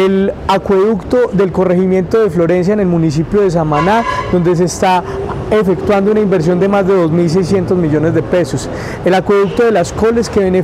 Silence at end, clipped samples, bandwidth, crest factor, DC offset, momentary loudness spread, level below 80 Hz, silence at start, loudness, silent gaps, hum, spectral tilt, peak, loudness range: 0 s; under 0.1%; 13.5 kHz; 10 dB; under 0.1%; 3 LU; -34 dBFS; 0 s; -12 LUFS; none; none; -7 dB/octave; -2 dBFS; 1 LU